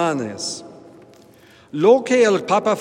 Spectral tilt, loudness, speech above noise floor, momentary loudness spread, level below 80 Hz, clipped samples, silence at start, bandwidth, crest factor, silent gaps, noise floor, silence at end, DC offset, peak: -4.5 dB/octave; -18 LUFS; 31 dB; 15 LU; -68 dBFS; under 0.1%; 0 s; 11 kHz; 18 dB; none; -49 dBFS; 0 s; under 0.1%; -2 dBFS